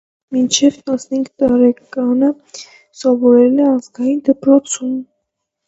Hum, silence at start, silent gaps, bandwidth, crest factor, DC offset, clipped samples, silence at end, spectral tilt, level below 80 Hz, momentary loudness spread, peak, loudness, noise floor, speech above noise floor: none; 0.3 s; none; 8.2 kHz; 14 dB; under 0.1%; under 0.1%; 0.65 s; -3.5 dB/octave; -58 dBFS; 12 LU; 0 dBFS; -14 LUFS; -74 dBFS; 61 dB